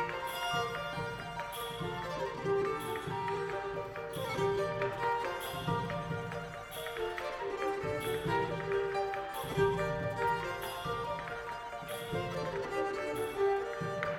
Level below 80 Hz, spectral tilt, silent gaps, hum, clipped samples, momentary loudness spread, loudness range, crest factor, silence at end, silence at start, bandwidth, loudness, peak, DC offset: -58 dBFS; -5 dB/octave; none; none; under 0.1%; 7 LU; 3 LU; 20 dB; 0 s; 0 s; 18 kHz; -36 LUFS; -16 dBFS; under 0.1%